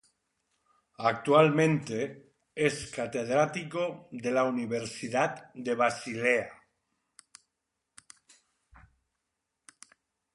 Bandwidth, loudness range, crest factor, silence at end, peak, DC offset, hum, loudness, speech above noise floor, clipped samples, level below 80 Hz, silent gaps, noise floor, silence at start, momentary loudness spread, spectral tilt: 11.5 kHz; 5 LU; 22 dB; 3.8 s; -8 dBFS; under 0.1%; none; -29 LUFS; 56 dB; under 0.1%; -70 dBFS; none; -84 dBFS; 1 s; 12 LU; -5.5 dB/octave